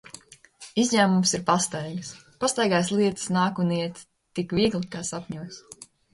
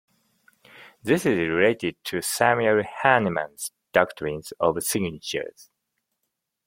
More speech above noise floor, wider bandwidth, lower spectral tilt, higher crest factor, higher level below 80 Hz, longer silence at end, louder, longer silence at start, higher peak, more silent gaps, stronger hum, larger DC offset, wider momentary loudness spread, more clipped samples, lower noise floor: second, 25 dB vs 57 dB; second, 11.5 kHz vs 16.5 kHz; about the same, -4.5 dB/octave vs -4 dB/octave; about the same, 20 dB vs 24 dB; about the same, -58 dBFS vs -60 dBFS; second, 0.3 s vs 1.05 s; about the same, -25 LUFS vs -23 LUFS; second, 0.6 s vs 0.8 s; second, -6 dBFS vs -2 dBFS; neither; neither; neither; first, 21 LU vs 11 LU; neither; second, -49 dBFS vs -80 dBFS